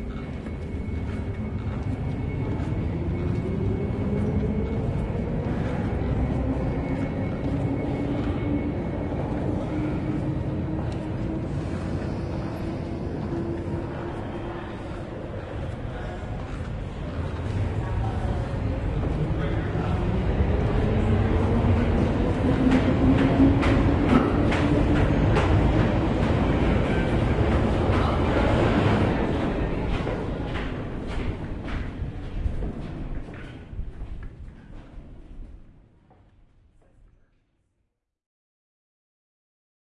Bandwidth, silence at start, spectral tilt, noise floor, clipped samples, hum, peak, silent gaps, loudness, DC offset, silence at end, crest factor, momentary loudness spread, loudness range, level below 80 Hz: 10.5 kHz; 0 s; -8.5 dB/octave; -76 dBFS; under 0.1%; none; -6 dBFS; none; -26 LUFS; under 0.1%; 4.1 s; 20 dB; 13 LU; 12 LU; -32 dBFS